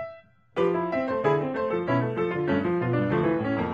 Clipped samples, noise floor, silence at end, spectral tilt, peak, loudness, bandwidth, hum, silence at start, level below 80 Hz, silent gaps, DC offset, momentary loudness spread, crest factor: under 0.1%; -47 dBFS; 0 s; -9 dB/octave; -10 dBFS; -26 LUFS; 7.2 kHz; none; 0 s; -58 dBFS; none; under 0.1%; 3 LU; 16 dB